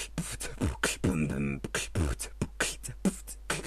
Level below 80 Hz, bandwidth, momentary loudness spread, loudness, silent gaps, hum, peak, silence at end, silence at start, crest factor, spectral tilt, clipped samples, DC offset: -42 dBFS; 14 kHz; 6 LU; -33 LUFS; none; none; -12 dBFS; 0 s; 0 s; 20 dB; -4 dB/octave; under 0.1%; under 0.1%